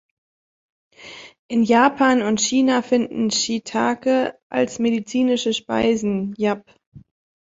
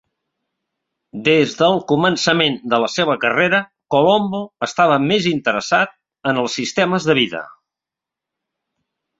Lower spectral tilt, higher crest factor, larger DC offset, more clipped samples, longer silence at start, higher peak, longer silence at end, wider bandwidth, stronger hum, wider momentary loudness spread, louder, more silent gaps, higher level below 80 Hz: about the same, -3.5 dB/octave vs -4.5 dB/octave; about the same, 18 dB vs 18 dB; neither; neither; second, 1 s vs 1.15 s; about the same, -2 dBFS vs 0 dBFS; second, 0.55 s vs 1.7 s; about the same, 8 kHz vs 8 kHz; neither; about the same, 9 LU vs 8 LU; second, -20 LUFS vs -17 LUFS; first, 1.39-1.49 s, 4.43-4.50 s, 6.86-6.92 s vs none; about the same, -58 dBFS vs -60 dBFS